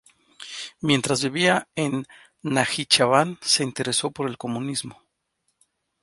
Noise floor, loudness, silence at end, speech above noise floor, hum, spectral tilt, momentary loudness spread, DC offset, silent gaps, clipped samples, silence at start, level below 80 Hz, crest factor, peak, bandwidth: -74 dBFS; -22 LUFS; 1.1 s; 51 dB; none; -3.5 dB/octave; 16 LU; under 0.1%; none; under 0.1%; 0.4 s; -64 dBFS; 22 dB; -2 dBFS; 11.5 kHz